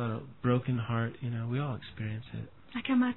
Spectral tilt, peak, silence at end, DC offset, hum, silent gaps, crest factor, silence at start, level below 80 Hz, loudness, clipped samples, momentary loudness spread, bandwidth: -11 dB/octave; -16 dBFS; 0 s; 0.2%; none; none; 16 dB; 0 s; -62 dBFS; -34 LUFS; under 0.1%; 11 LU; 4.2 kHz